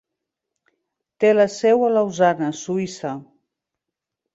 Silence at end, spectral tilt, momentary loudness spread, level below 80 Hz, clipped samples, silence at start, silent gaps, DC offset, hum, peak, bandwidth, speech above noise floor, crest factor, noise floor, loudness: 1.1 s; -5.5 dB/octave; 13 LU; -68 dBFS; under 0.1%; 1.2 s; none; under 0.1%; none; -4 dBFS; 8 kHz; 66 dB; 18 dB; -84 dBFS; -19 LUFS